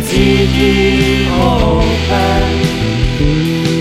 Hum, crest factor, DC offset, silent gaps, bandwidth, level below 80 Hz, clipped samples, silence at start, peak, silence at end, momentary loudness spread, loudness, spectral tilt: none; 12 dB; under 0.1%; none; 16 kHz; -20 dBFS; under 0.1%; 0 s; 0 dBFS; 0 s; 4 LU; -12 LUFS; -6 dB/octave